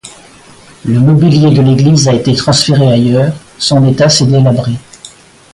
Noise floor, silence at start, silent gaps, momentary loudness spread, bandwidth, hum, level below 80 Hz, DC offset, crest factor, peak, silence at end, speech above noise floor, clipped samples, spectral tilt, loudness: -37 dBFS; 0.05 s; none; 8 LU; 11.5 kHz; none; -40 dBFS; under 0.1%; 10 dB; 0 dBFS; 0.45 s; 30 dB; under 0.1%; -6 dB/octave; -8 LUFS